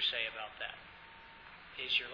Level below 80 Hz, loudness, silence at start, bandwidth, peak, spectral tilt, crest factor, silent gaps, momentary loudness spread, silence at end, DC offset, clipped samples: -68 dBFS; -38 LUFS; 0 s; 5.4 kHz; -20 dBFS; -2 dB/octave; 22 dB; none; 20 LU; 0 s; under 0.1%; under 0.1%